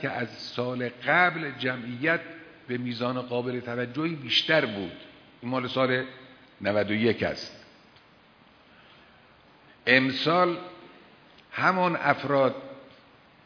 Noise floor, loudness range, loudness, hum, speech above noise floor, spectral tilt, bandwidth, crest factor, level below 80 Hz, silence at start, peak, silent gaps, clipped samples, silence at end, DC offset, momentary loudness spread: -57 dBFS; 5 LU; -26 LUFS; none; 30 dB; -6 dB/octave; 5.4 kHz; 24 dB; -68 dBFS; 0 s; -4 dBFS; none; under 0.1%; 0.6 s; under 0.1%; 17 LU